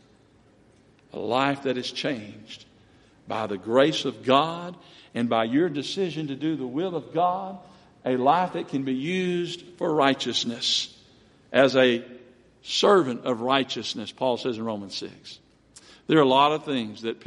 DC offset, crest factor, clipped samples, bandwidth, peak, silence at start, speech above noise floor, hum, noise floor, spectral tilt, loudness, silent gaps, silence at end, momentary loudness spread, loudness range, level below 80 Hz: under 0.1%; 22 dB; under 0.1%; 11.5 kHz; -4 dBFS; 1.15 s; 33 dB; none; -58 dBFS; -4.5 dB/octave; -25 LUFS; none; 0.1 s; 16 LU; 4 LU; -68 dBFS